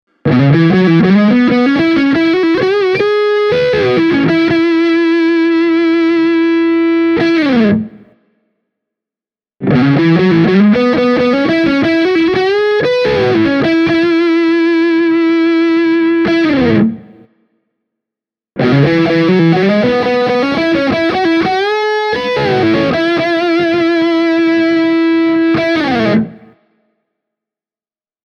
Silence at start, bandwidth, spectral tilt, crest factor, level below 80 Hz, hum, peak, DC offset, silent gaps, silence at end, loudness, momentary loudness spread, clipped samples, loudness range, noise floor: 0.25 s; 6.6 kHz; -7.5 dB/octave; 12 dB; -46 dBFS; none; 0 dBFS; under 0.1%; none; 1.9 s; -11 LUFS; 4 LU; under 0.1%; 3 LU; under -90 dBFS